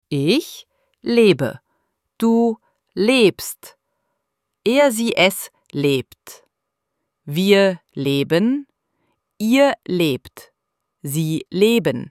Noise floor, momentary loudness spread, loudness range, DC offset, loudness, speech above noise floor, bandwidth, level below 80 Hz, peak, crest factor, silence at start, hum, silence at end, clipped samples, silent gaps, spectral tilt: -78 dBFS; 15 LU; 2 LU; under 0.1%; -18 LUFS; 61 dB; 16.5 kHz; -62 dBFS; -2 dBFS; 18 dB; 0.1 s; none; 0 s; under 0.1%; none; -5 dB/octave